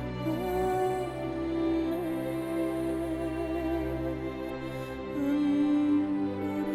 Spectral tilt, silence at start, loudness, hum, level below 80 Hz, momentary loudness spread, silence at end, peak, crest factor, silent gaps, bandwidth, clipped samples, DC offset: -7.5 dB/octave; 0 s; -31 LUFS; none; -48 dBFS; 9 LU; 0 s; -18 dBFS; 12 dB; none; 14 kHz; under 0.1%; under 0.1%